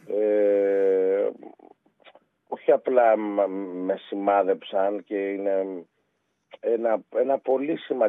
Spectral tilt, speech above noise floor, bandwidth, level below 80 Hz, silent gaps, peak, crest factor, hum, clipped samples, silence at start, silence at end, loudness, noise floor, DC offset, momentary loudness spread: -8 dB/octave; 50 dB; 3.9 kHz; -90 dBFS; none; -8 dBFS; 18 dB; none; under 0.1%; 0.05 s; 0 s; -24 LUFS; -74 dBFS; under 0.1%; 9 LU